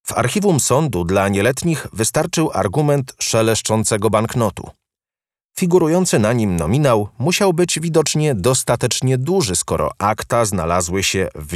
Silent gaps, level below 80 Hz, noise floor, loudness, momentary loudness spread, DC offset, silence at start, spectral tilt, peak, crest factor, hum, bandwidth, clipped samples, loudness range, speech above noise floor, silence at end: 5.45-5.49 s; -42 dBFS; under -90 dBFS; -17 LUFS; 4 LU; under 0.1%; 0.05 s; -4.5 dB/octave; -2 dBFS; 14 dB; none; 15 kHz; under 0.1%; 2 LU; over 73 dB; 0 s